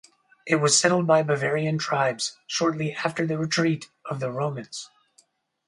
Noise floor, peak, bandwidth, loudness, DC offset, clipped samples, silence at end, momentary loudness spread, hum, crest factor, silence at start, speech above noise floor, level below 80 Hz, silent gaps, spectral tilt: -63 dBFS; -4 dBFS; 11.5 kHz; -24 LUFS; under 0.1%; under 0.1%; 0.8 s; 16 LU; none; 20 dB; 0.45 s; 39 dB; -70 dBFS; none; -4 dB/octave